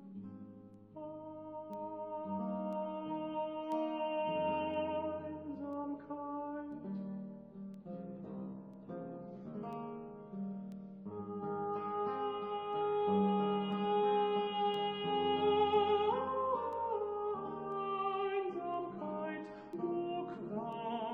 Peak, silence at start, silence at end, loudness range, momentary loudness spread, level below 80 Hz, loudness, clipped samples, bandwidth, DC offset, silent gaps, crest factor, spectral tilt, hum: -20 dBFS; 0 s; 0 s; 13 LU; 15 LU; -74 dBFS; -38 LUFS; under 0.1%; 5.2 kHz; under 0.1%; none; 18 dB; -8 dB/octave; none